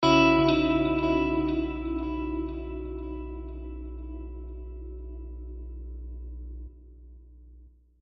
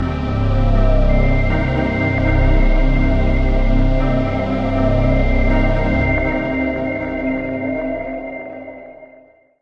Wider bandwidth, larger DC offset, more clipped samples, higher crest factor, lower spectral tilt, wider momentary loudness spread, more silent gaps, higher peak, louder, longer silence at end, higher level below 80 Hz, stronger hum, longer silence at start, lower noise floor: first, 7.4 kHz vs 5.6 kHz; neither; neither; first, 22 dB vs 14 dB; second, -4.5 dB/octave vs -9 dB/octave; first, 19 LU vs 9 LU; neither; second, -8 dBFS vs -2 dBFS; second, -27 LUFS vs -18 LUFS; second, 0.35 s vs 0.55 s; second, -40 dBFS vs -18 dBFS; first, 60 Hz at -40 dBFS vs none; about the same, 0 s vs 0 s; first, -53 dBFS vs -47 dBFS